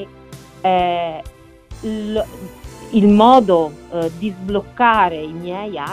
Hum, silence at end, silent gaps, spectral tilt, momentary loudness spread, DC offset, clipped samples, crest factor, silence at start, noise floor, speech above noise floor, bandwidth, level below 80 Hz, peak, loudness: none; 0 s; none; -6.5 dB/octave; 20 LU; under 0.1%; under 0.1%; 18 dB; 0 s; -39 dBFS; 23 dB; 14.5 kHz; -42 dBFS; 0 dBFS; -17 LUFS